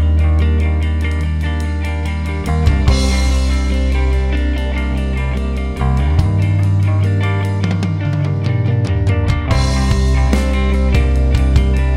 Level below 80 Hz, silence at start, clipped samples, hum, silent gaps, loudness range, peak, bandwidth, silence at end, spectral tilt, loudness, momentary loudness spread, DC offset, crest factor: -16 dBFS; 0 s; under 0.1%; none; none; 2 LU; 0 dBFS; 11 kHz; 0 s; -6.5 dB/octave; -16 LUFS; 5 LU; under 0.1%; 14 dB